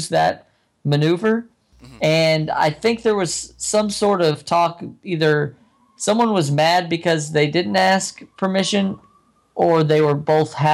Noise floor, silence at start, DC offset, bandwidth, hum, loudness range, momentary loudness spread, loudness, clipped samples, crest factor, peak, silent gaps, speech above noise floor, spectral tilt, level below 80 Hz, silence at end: -57 dBFS; 0 s; under 0.1%; 14 kHz; none; 1 LU; 9 LU; -19 LUFS; under 0.1%; 14 dB; -6 dBFS; none; 39 dB; -5 dB/octave; -58 dBFS; 0 s